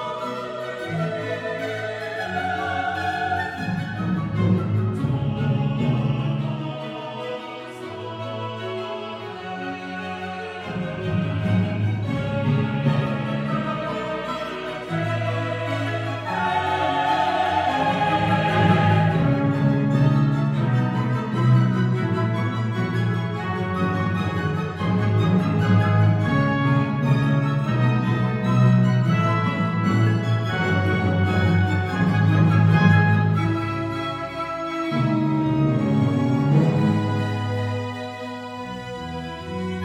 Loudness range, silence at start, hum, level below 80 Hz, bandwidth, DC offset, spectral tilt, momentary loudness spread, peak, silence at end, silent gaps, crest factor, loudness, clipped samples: 7 LU; 0 s; none; -50 dBFS; 9.4 kHz; under 0.1%; -8 dB/octave; 12 LU; -4 dBFS; 0 s; none; 18 dB; -22 LUFS; under 0.1%